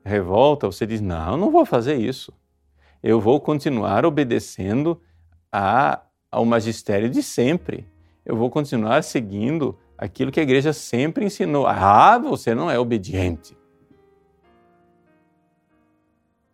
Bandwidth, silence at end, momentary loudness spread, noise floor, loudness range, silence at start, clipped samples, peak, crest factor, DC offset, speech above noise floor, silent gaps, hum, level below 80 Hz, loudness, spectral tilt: 15.5 kHz; 3.15 s; 11 LU; -67 dBFS; 5 LU; 0.05 s; under 0.1%; 0 dBFS; 20 dB; under 0.1%; 47 dB; none; none; -50 dBFS; -20 LUFS; -6.5 dB/octave